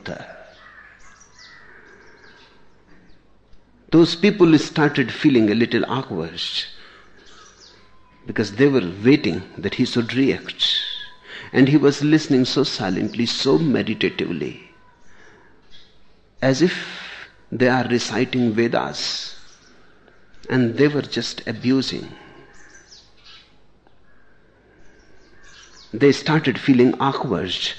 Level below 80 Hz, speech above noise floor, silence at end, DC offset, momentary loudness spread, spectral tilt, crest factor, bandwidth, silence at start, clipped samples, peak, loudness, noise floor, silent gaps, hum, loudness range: -56 dBFS; 37 dB; 0 s; under 0.1%; 15 LU; -5.5 dB/octave; 18 dB; 9 kHz; 0.05 s; under 0.1%; -2 dBFS; -19 LUFS; -56 dBFS; none; none; 7 LU